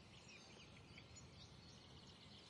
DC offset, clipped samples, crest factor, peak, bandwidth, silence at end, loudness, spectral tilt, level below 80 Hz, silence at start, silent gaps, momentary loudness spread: under 0.1%; under 0.1%; 14 dB; -48 dBFS; 11 kHz; 0 s; -61 LUFS; -3.5 dB/octave; -76 dBFS; 0 s; none; 1 LU